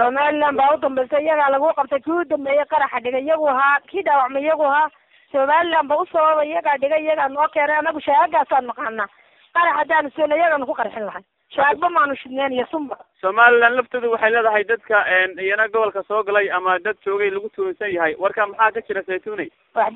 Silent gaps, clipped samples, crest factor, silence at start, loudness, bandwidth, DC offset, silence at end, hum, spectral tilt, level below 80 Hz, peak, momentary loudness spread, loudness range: none; under 0.1%; 18 dB; 0 s; -19 LUFS; 4.1 kHz; under 0.1%; 0 s; none; -6 dB/octave; -64 dBFS; 0 dBFS; 9 LU; 3 LU